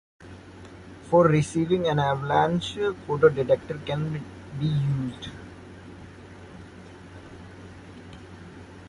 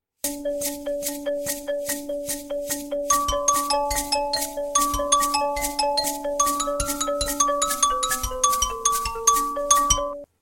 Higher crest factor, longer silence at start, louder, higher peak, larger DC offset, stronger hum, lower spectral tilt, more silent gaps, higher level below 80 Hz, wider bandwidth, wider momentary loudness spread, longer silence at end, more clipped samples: about the same, 20 dB vs 22 dB; about the same, 0.2 s vs 0.25 s; about the same, -24 LUFS vs -23 LUFS; second, -6 dBFS vs -2 dBFS; neither; neither; first, -7 dB/octave vs -1 dB/octave; neither; second, -52 dBFS vs -40 dBFS; second, 11.5 kHz vs 17 kHz; first, 24 LU vs 8 LU; second, 0 s vs 0.15 s; neither